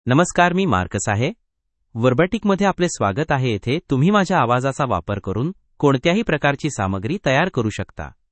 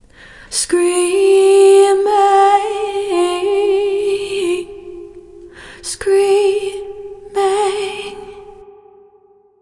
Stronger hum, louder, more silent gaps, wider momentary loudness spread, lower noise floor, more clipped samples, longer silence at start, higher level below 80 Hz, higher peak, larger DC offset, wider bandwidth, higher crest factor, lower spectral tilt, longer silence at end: neither; second, -19 LUFS vs -14 LUFS; neither; second, 9 LU vs 20 LU; first, -72 dBFS vs -50 dBFS; neither; second, 0.05 s vs 0.5 s; about the same, -46 dBFS vs -50 dBFS; about the same, 0 dBFS vs 0 dBFS; neither; second, 8.8 kHz vs 11.5 kHz; first, 20 dB vs 14 dB; first, -5.5 dB/octave vs -2.5 dB/octave; second, 0.25 s vs 1 s